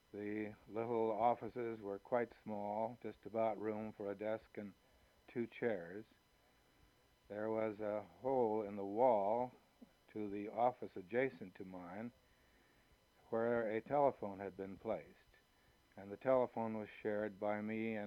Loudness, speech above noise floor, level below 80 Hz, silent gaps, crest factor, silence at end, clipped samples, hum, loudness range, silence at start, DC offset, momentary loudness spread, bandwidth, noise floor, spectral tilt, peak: -41 LUFS; 32 dB; -78 dBFS; none; 22 dB; 0 s; under 0.1%; none; 6 LU; 0.15 s; under 0.1%; 15 LU; 14.5 kHz; -73 dBFS; -8 dB/octave; -20 dBFS